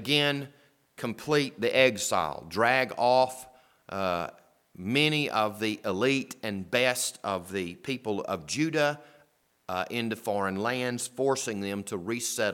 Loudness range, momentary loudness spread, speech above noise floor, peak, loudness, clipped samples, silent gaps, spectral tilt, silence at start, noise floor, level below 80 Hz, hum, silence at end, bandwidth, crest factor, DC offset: 5 LU; 11 LU; 37 dB; -6 dBFS; -28 LUFS; under 0.1%; none; -3.5 dB/octave; 0 s; -66 dBFS; -68 dBFS; none; 0 s; 18 kHz; 22 dB; under 0.1%